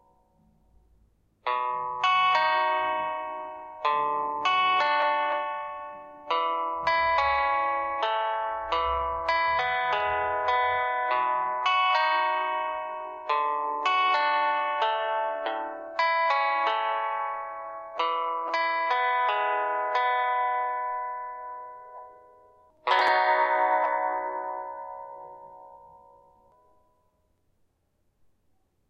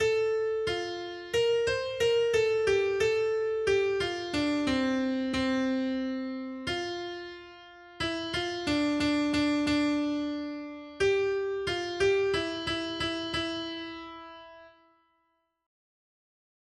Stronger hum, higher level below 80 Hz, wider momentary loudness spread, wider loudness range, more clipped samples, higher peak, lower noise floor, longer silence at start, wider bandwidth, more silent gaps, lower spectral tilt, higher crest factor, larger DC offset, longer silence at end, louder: neither; about the same, -58 dBFS vs -56 dBFS; about the same, 14 LU vs 12 LU; second, 3 LU vs 6 LU; neither; first, -10 dBFS vs -14 dBFS; about the same, -72 dBFS vs -75 dBFS; first, 1.45 s vs 0 s; second, 7.4 kHz vs 12.5 kHz; neither; second, -3 dB/octave vs -4.5 dB/octave; about the same, 18 dB vs 14 dB; neither; first, 3 s vs 1.95 s; first, -26 LUFS vs -29 LUFS